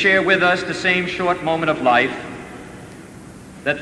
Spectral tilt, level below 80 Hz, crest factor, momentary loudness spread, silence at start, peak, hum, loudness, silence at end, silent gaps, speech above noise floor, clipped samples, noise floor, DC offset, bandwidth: -4.5 dB/octave; -52 dBFS; 16 dB; 23 LU; 0 s; -2 dBFS; none; -18 LUFS; 0 s; none; 21 dB; under 0.1%; -39 dBFS; under 0.1%; 11 kHz